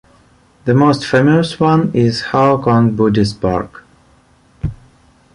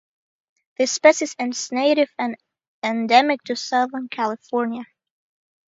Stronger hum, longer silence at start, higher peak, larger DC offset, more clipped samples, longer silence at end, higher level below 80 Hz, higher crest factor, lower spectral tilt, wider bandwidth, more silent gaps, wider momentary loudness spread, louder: neither; second, 0.65 s vs 0.8 s; about the same, -2 dBFS vs 0 dBFS; neither; neither; second, 0.6 s vs 0.85 s; first, -40 dBFS vs -76 dBFS; second, 14 dB vs 22 dB; first, -7 dB/octave vs -2.5 dB/octave; first, 11 kHz vs 8 kHz; second, none vs 2.68-2.82 s; about the same, 14 LU vs 12 LU; first, -13 LUFS vs -21 LUFS